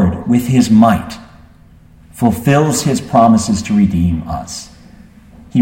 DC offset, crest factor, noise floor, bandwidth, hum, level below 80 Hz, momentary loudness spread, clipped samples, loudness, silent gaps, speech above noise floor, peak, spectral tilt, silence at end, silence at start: under 0.1%; 14 dB; -43 dBFS; 16.5 kHz; none; -36 dBFS; 14 LU; under 0.1%; -13 LUFS; none; 31 dB; 0 dBFS; -6 dB/octave; 0 s; 0 s